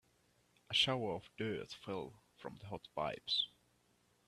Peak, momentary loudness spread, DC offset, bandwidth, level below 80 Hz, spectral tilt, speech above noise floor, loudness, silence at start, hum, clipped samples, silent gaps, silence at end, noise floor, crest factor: -20 dBFS; 19 LU; under 0.1%; 14 kHz; -74 dBFS; -4 dB/octave; 35 dB; -39 LUFS; 0.7 s; 60 Hz at -70 dBFS; under 0.1%; none; 0.8 s; -75 dBFS; 24 dB